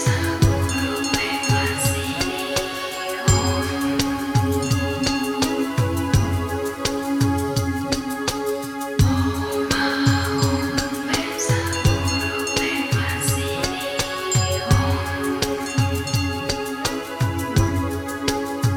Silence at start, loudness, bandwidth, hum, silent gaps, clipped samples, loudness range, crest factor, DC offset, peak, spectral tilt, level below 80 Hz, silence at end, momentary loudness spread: 0 s; -22 LUFS; 18.5 kHz; none; none; under 0.1%; 2 LU; 18 dB; under 0.1%; -4 dBFS; -4.5 dB/octave; -36 dBFS; 0 s; 5 LU